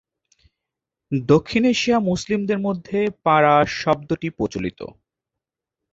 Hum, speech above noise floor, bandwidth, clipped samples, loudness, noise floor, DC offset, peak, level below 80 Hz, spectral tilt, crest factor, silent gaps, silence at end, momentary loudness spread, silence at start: none; 66 dB; 8 kHz; under 0.1%; -20 LUFS; -85 dBFS; under 0.1%; -2 dBFS; -52 dBFS; -6 dB/octave; 20 dB; none; 1 s; 11 LU; 1.1 s